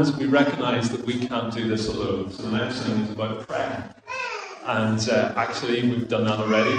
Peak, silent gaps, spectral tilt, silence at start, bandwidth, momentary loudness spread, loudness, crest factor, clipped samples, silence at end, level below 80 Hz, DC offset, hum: -6 dBFS; none; -5.5 dB/octave; 0 s; 9.8 kHz; 9 LU; -25 LUFS; 18 dB; under 0.1%; 0 s; -54 dBFS; under 0.1%; none